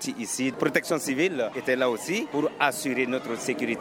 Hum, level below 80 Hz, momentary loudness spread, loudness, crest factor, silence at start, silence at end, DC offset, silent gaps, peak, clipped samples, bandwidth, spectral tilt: none; -72 dBFS; 4 LU; -26 LUFS; 20 dB; 0 s; 0 s; under 0.1%; none; -6 dBFS; under 0.1%; 18.5 kHz; -3.5 dB/octave